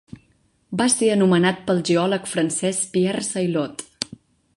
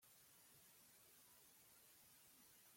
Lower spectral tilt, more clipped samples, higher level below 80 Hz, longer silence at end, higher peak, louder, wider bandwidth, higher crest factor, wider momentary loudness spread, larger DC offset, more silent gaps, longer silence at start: first, -4.5 dB/octave vs -1 dB/octave; neither; first, -62 dBFS vs under -90 dBFS; first, 0.4 s vs 0 s; first, -2 dBFS vs -56 dBFS; first, -21 LUFS vs -67 LUFS; second, 11.5 kHz vs 16.5 kHz; first, 20 dB vs 14 dB; first, 13 LU vs 0 LU; neither; neither; first, 0.7 s vs 0 s